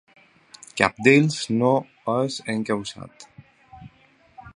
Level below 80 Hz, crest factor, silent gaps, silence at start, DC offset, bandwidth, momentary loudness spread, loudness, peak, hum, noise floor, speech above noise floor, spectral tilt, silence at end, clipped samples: -60 dBFS; 24 dB; none; 0.75 s; under 0.1%; 11 kHz; 19 LU; -21 LUFS; 0 dBFS; none; -57 dBFS; 36 dB; -5.5 dB/octave; 0.05 s; under 0.1%